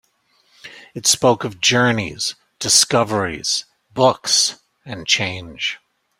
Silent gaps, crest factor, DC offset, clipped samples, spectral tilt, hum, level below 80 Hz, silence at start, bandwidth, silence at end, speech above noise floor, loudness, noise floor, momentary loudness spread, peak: none; 20 dB; under 0.1%; under 0.1%; -2 dB/octave; none; -54 dBFS; 0.65 s; 16 kHz; 0.45 s; 43 dB; -17 LUFS; -61 dBFS; 13 LU; 0 dBFS